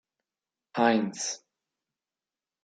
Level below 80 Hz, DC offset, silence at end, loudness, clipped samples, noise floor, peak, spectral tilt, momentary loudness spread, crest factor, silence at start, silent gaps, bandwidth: -82 dBFS; under 0.1%; 1.25 s; -27 LUFS; under 0.1%; under -90 dBFS; -8 dBFS; -3.5 dB/octave; 14 LU; 24 dB; 0.75 s; none; 9.4 kHz